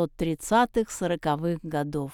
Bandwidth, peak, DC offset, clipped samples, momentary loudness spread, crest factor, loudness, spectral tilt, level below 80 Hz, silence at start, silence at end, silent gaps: 18.5 kHz; -10 dBFS; under 0.1%; under 0.1%; 7 LU; 16 dB; -27 LUFS; -5.5 dB/octave; -48 dBFS; 0 s; 0 s; none